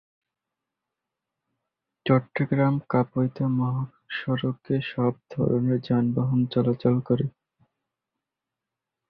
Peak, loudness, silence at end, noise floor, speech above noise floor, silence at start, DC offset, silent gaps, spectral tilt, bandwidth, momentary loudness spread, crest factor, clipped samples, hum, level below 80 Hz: -6 dBFS; -25 LUFS; 1.8 s; -87 dBFS; 63 dB; 2.05 s; under 0.1%; none; -11 dB/octave; 5.2 kHz; 5 LU; 20 dB; under 0.1%; none; -60 dBFS